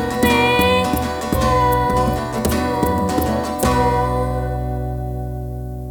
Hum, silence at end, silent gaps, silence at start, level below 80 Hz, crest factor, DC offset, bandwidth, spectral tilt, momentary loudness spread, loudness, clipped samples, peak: none; 0 s; none; 0 s; -28 dBFS; 16 dB; under 0.1%; 19.5 kHz; -5.5 dB/octave; 11 LU; -18 LUFS; under 0.1%; -2 dBFS